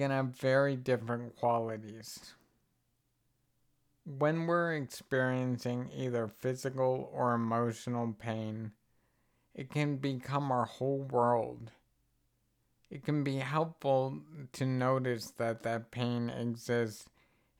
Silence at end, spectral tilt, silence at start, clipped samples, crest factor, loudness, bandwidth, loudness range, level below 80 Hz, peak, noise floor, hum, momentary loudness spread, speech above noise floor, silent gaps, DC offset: 0.55 s; -6.5 dB/octave; 0 s; under 0.1%; 18 dB; -34 LUFS; 16.5 kHz; 3 LU; -74 dBFS; -16 dBFS; -78 dBFS; none; 15 LU; 44 dB; none; under 0.1%